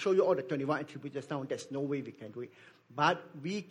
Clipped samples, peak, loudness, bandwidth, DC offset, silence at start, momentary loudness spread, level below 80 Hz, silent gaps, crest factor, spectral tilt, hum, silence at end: under 0.1%; -14 dBFS; -34 LUFS; 11 kHz; under 0.1%; 0 s; 15 LU; -80 dBFS; none; 20 dB; -6 dB/octave; none; 0 s